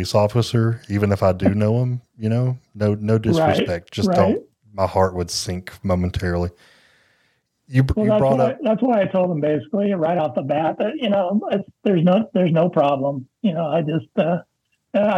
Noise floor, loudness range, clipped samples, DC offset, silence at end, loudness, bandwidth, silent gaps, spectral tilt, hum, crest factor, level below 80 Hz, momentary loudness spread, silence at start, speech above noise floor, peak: -66 dBFS; 3 LU; under 0.1%; under 0.1%; 0 s; -20 LUFS; 14.5 kHz; none; -7 dB/octave; none; 18 dB; -44 dBFS; 7 LU; 0 s; 46 dB; -2 dBFS